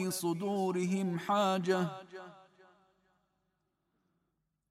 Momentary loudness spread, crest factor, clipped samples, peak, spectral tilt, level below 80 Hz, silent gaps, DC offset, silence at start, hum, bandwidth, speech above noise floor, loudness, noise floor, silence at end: 19 LU; 18 dB; under 0.1%; -18 dBFS; -5.5 dB/octave; -84 dBFS; none; under 0.1%; 0 s; none; 16 kHz; 49 dB; -33 LUFS; -82 dBFS; 2.3 s